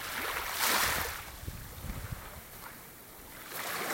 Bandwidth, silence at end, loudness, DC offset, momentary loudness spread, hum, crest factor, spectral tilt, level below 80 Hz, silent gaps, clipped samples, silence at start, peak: 17 kHz; 0 s; -33 LUFS; under 0.1%; 19 LU; none; 22 dB; -1.5 dB/octave; -50 dBFS; none; under 0.1%; 0 s; -14 dBFS